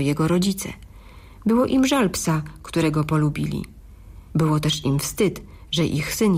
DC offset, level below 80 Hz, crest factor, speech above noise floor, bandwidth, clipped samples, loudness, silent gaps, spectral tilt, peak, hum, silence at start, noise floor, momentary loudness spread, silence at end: under 0.1%; -44 dBFS; 14 dB; 23 dB; 16 kHz; under 0.1%; -22 LUFS; none; -5.5 dB/octave; -8 dBFS; none; 0 s; -43 dBFS; 10 LU; 0 s